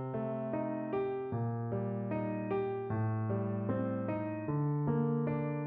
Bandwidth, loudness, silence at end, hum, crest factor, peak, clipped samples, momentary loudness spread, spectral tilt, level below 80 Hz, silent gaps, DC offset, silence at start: 3.8 kHz; -35 LUFS; 0 s; none; 14 dB; -20 dBFS; under 0.1%; 4 LU; -10 dB/octave; -66 dBFS; none; under 0.1%; 0 s